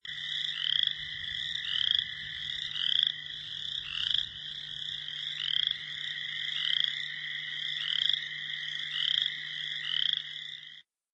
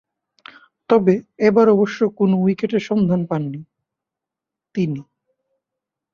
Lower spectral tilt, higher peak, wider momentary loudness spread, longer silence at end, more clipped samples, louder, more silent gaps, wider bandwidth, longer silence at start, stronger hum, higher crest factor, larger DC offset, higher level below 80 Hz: second, 0 dB/octave vs -8.5 dB/octave; second, -10 dBFS vs -2 dBFS; second, 9 LU vs 13 LU; second, 0.3 s vs 1.1 s; neither; second, -30 LUFS vs -18 LUFS; neither; first, 8.6 kHz vs 7 kHz; second, 0.05 s vs 0.9 s; neither; first, 24 dB vs 18 dB; neither; second, -68 dBFS vs -62 dBFS